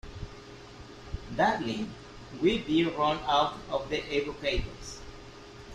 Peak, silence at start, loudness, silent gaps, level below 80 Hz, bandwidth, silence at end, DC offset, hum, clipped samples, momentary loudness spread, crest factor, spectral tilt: -12 dBFS; 0.05 s; -29 LUFS; none; -46 dBFS; 12 kHz; 0 s; under 0.1%; none; under 0.1%; 21 LU; 18 dB; -5 dB/octave